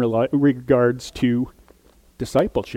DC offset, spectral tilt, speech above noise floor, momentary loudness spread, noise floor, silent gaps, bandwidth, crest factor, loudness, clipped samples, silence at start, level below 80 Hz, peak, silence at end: under 0.1%; -7 dB/octave; 34 dB; 7 LU; -53 dBFS; none; 15.5 kHz; 16 dB; -20 LUFS; under 0.1%; 0 s; -46 dBFS; -4 dBFS; 0 s